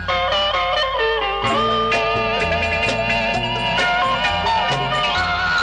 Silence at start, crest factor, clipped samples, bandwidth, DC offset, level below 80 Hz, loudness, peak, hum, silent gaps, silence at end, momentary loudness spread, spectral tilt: 0 s; 12 dB; under 0.1%; 10.5 kHz; under 0.1%; -38 dBFS; -18 LUFS; -8 dBFS; none; none; 0 s; 2 LU; -4 dB/octave